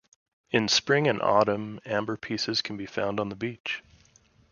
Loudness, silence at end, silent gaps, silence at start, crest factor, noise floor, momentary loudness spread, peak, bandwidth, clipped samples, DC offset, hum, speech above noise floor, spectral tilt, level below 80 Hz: -27 LUFS; 0.7 s; 3.60-3.64 s; 0.5 s; 22 dB; -61 dBFS; 11 LU; -6 dBFS; 7.4 kHz; under 0.1%; under 0.1%; none; 34 dB; -4 dB/octave; -64 dBFS